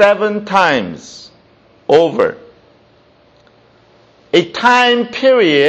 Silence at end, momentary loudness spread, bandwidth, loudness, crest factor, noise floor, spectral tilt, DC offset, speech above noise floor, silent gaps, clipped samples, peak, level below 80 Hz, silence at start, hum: 0 s; 18 LU; 8.6 kHz; -12 LUFS; 14 dB; -49 dBFS; -4.5 dB/octave; under 0.1%; 38 dB; none; under 0.1%; 0 dBFS; -58 dBFS; 0 s; none